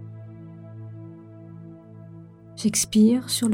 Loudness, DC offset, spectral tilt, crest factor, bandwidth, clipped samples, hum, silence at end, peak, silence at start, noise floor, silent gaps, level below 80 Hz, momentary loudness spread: -21 LUFS; under 0.1%; -4 dB/octave; 18 dB; 16.5 kHz; under 0.1%; none; 0 s; -8 dBFS; 0 s; -44 dBFS; none; -60 dBFS; 25 LU